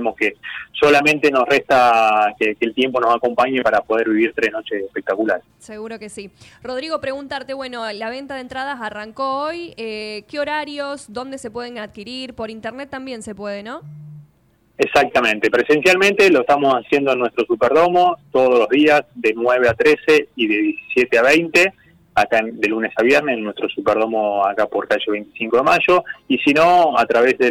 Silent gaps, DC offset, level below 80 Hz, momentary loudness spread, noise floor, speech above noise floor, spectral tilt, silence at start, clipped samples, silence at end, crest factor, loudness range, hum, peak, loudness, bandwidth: none; under 0.1%; -54 dBFS; 16 LU; -58 dBFS; 40 dB; -4.5 dB/octave; 0 s; under 0.1%; 0 s; 12 dB; 12 LU; none; -6 dBFS; -17 LUFS; 16.5 kHz